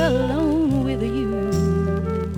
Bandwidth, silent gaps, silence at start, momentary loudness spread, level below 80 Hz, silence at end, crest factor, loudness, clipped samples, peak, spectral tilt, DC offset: 16 kHz; none; 0 s; 3 LU; -34 dBFS; 0 s; 14 dB; -21 LUFS; under 0.1%; -8 dBFS; -7.5 dB/octave; under 0.1%